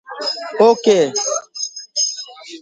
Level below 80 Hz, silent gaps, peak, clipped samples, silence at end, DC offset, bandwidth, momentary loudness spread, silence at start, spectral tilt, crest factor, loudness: -70 dBFS; none; 0 dBFS; under 0.1%; 0 s; under 0.1%; 10 kHz; 13 LU; 0.1 s; -2 dB/octave; 18 dB; -17 LUFS